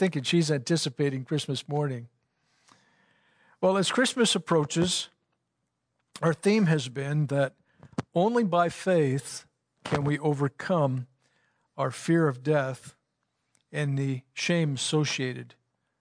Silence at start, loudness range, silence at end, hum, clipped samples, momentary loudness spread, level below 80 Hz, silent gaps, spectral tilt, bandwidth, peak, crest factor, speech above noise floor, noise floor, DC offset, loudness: 0 s; 4 LU; 0.55 s; none; under 0.1%; 12 LU; -68 dBFS; none; -5 dB/octave; 11 kHz; -12 dBFS; 16 dB; 54 dB; -80 dBFS; under 0.1%; -27 LUFS